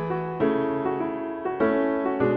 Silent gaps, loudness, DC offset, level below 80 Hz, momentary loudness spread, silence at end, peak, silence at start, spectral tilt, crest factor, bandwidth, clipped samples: none; -25 LUFS; under 0.1%; -58 dBFS; 6 LU; 0 s; -10 dBFS; 0 s; -10 dB/octave; 14 dB; 4.9 kHz; under 0.1%